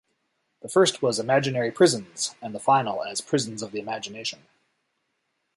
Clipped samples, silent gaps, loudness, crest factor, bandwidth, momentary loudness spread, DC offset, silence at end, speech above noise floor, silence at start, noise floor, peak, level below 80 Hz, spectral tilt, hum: under 0.1%; none; -24 LUFS; 20 dB; 11.5 kHz; 12 LU; under 0.1%; 1.2 s; 52 dB; 0.65 s; -76 dBFS; -6 dBFS; -70 dBFS; -4 dB/octave; none